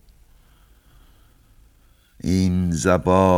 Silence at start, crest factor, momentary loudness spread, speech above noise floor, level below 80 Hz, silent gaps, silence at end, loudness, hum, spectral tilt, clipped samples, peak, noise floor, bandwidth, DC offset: 2.25 s; 20 dB; 7 LU; 38 dB; -44 dBFS; none; 0 s; -20 LUFS; none; -6.5 dB/octave; under 0.1%; -2 dBFS; -55 dBFS; 15 kHz; under 0.1%